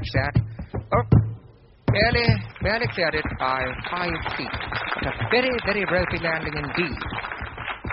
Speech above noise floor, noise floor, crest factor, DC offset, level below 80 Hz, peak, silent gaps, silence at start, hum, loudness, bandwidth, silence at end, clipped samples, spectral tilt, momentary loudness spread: 26 dB; -49 dBFS; 20 dB; under 0.1%; -36 dBFS; -4 dBFS; none; 0 s; none; -24 LUFS; 5.8 kHz; 0 s; under 0.1%; -4.5 dB/octave; 11 LU